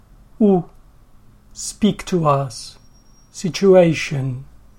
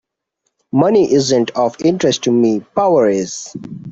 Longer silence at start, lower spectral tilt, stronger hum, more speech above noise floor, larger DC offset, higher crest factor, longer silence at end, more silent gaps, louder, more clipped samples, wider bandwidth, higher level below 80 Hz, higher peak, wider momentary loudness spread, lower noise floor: second, 0.4 s vs 0.75 s; about the same, -6 dB/octave vs -5 dB/octave; neither; second, 31 dB vs 57 dB; neither; about the same, 18 dB vs 14 dB; first, 0.35 s vs 0 s; neither; second, -18 LUFS vs -14 LUFS; neither; first, 16 kHz vs 8 kHz; first, -46 dBFS vs -56 dBFS; about the same, -2 dBFS vs -2 dBFS; first, 21 LU vs 11 LU; second, -48 dBFS vs -71 dBFS